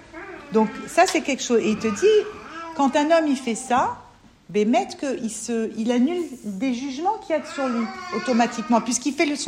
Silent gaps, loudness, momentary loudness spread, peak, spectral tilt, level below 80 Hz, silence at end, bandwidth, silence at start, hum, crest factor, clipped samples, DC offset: none; -22 LUFS; 9 LU; -4 dBFS; -4 dB/octave; -60 dBFS; 0 s; 15.5 kHz; 0 s; none; 18 dB; under 0.1%; under 0.1%